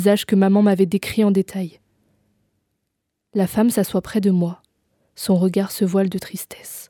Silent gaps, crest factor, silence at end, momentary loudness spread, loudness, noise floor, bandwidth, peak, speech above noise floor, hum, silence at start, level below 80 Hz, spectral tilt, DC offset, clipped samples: none; 16 dB; 0.05 s; 14 LU; -19 LUFS; -77 dBFS; 18.5 kHz; -4 dBFS; 58 dB; none; 0 s; -56 dBFS; -6.5 dB/octave; under 0.1%; under 0.1%